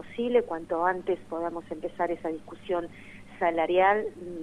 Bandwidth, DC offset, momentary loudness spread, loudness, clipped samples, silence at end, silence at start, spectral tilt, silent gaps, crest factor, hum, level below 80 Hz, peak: 11 kHz; 0.2%; 14 LU; -28 LUFS; under 0.1%; 0 s; 0 s; -6.5 dB/octave; none; 20 dB; none; -58 dBFS; -10 dBFS